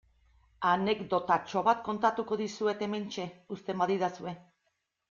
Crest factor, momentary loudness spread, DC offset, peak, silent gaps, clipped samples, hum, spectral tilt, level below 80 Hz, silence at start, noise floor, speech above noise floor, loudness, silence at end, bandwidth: 20 dB; 12 LU; under 0.1%; -12 dBFS; none; under 0.1%; none; -5.5 dB/octave; -68 dBFS; 0.6 s; -79 dBFS; 49 dB; -31 LUFS; 0.7 s; 7.6 kHz